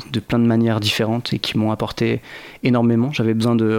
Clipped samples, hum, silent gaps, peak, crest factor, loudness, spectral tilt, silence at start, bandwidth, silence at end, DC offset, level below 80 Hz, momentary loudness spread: under 0.1%; none; none; -4 dBFS; 14 dB; -19 LUFS; -6.5 dB/octave; 0 s; 16 kHz; 0 s; under 0.1%; -48 dBFS; 5 LU